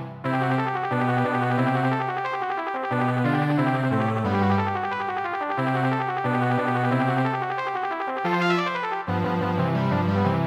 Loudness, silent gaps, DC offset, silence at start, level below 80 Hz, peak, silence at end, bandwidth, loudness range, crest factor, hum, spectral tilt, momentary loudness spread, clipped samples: -24 LUFS; none; under 0.1%; 0 s; -64 dBFS; -10 dBFS; 0 s; 10.5 kHz; 1 LU; 14 dB; none; -8 dB/octave; 5 LU; under 0.1%